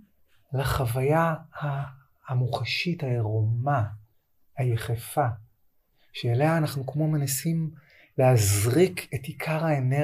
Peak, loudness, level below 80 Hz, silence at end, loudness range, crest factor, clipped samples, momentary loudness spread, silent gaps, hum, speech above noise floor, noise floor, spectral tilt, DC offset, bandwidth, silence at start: -10 dBFS; -26 LUFS; -52 dBFS; 0 s; 4 LU; 16 dB; under 0.1%; 12 LU; none; none; 40 dB; -65 dBFS; -5.5 dB/octave; under 0.1%; 15.5 kHz; 0.5 s